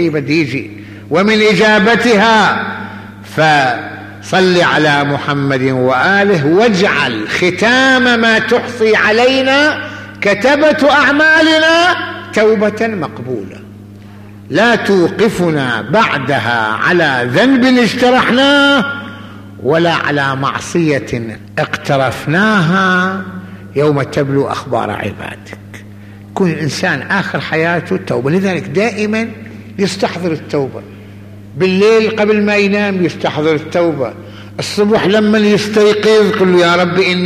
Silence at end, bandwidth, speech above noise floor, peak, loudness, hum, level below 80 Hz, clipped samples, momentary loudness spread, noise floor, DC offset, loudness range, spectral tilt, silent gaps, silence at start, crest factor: 0 s; 14.5 kHz; 22 dB; -2 dBFS; -12 LUFS; none; -48 dBFS; under 0.1%; 13 LU; -33 dBFS; under 0.1%; 6 LU; -5 dB/octave; none; 0 s; 10 dB